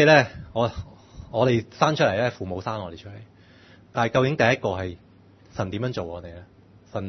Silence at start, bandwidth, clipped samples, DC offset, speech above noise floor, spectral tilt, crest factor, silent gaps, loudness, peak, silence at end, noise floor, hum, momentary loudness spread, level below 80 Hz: 0 s; 6.4 kHz; under 0.1%; under 0.1%; 29 dB; -6 dB/octave; 22 dB; none; -24 LUFS; -2 dBFS; 0 s; -52 dBFS; none; 18 LU; -54 dBFS